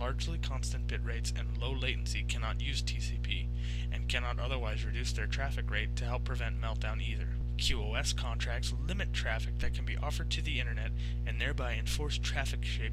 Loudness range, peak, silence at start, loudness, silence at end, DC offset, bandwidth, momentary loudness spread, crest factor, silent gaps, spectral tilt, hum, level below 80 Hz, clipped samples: 1 LU; -16 dBFS; 0 s; -35 LUFS; 0 s; 0.3%; 12.5 kHz; 3 LU; 18 dB; none; -4 dB/octave; 60 Hz at -35 dBFS; -34 dBFS; under 0.1%